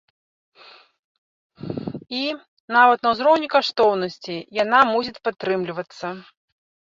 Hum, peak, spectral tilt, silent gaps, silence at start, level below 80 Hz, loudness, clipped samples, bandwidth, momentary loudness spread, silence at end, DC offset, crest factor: none; -2 dBFS; -5 dB/octave; 2.48-2.68 s; 1.6 s; -64 dBFS; -20 LUFS; under 0.1%; 7.6 kHz; 16 LU; 0.65 s; under 0.1%; 20 dB